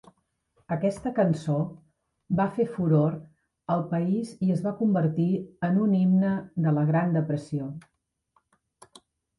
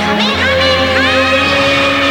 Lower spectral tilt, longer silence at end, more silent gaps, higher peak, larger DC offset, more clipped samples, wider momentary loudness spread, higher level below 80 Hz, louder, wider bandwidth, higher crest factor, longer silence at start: first, -9.5 dB/octave vs -4 dB/octave; first, 1.6 s vs 0 s; neither; second, -12 dBFS vs -2 dBFS; neither; neither; first, 10 LU vs 1 LU; second, -64 dBFS vs -36 dBFS; second, -26 LUFS vs -10 LUFS; second, 11.5 kHz vs over 20 kHz; first, 16 dB vs 8 dB; first, 0.7 s vs 0 s